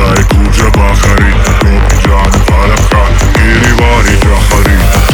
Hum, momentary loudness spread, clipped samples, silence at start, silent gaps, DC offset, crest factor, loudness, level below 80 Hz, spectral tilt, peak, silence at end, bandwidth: none; 1 LU; 0.8%; 0 s; none; 0.9%; 6 dB; -7 LUFS; -8 dBFS; -5 dB/octave; 0 dBFS; 0 s; 19.5 kHz